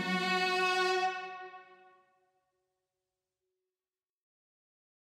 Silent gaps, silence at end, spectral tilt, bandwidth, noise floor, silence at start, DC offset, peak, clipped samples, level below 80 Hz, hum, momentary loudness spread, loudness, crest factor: none; 3.3 s; -3.5 dB/octave; 16 kHz; under -90 dBFS; 0 s; under 0.1%; -18 dBFS; under 0.1%; under -90 dBFS; none; 17 LU; -30 LUFS; 18 dB